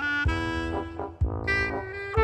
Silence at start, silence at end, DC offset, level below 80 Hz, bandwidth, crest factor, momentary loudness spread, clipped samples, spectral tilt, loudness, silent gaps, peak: 0 s; 0 s; under 0.1%; -34 dBFS; 9.2 kHz; 18 dB; 7 LU; under 0.1%; -6.5 dB/octave; -28 LUFS; none; -10 dBFS